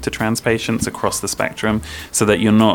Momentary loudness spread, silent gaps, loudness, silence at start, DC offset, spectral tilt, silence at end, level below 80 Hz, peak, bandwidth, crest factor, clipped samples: 7 LU; none; -18 LUFS; 0 s; under 0.1%; -4.5 dB/octave; 0 s; -40 dBFS; 0 dBFS; 18 kHz; 18 dB; under 0.1%